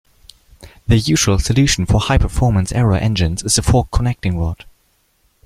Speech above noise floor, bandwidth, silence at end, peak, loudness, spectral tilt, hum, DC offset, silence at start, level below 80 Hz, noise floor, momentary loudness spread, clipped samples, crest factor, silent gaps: 45 dB; 15 kHz; 0.9 s; -2 dBFS; -16 LUFS; -5 dB/octave; none; under 0.1%; 0.6 s; -26 dBFS; -60 dBFS; 6 LU; under 0.1%; 16 dB; none